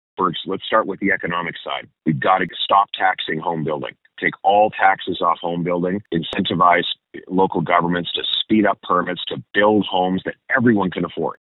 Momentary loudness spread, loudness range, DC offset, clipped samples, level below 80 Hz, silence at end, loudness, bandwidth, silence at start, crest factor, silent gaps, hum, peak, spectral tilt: 9 LU; 2 LU; under 0.1%; under 0.1%; -58 dBFS; 0.15 s; -19 LUFS; 4.1 kHz; 0.2 s; 20 dB; none; none; 0 dBFS; -8 dB/octave